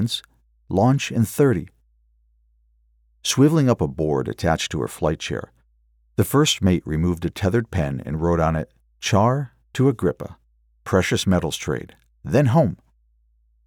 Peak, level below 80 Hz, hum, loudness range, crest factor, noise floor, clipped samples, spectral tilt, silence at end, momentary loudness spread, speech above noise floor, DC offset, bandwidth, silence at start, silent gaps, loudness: -4 dBFS; -42 dBFS; none; 1 LU; 18 dB; -61 dBFS; under 0.1%; -5.5 dB/octave; 0.9 s; 11 LU; 41 dB; under 0.1%; 20 kHz; 0 s; none; -21 LUFS